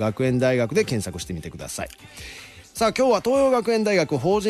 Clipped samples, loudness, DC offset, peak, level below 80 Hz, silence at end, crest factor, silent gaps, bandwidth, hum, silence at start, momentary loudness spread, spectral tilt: under 0.1%; -22 LUFS; under 0.1%; -8 dBFS; -48 dBFS; 0 s; 14 dB; none; 13 kHz; none; 0 s; 18 LU; -5.5 dB/octave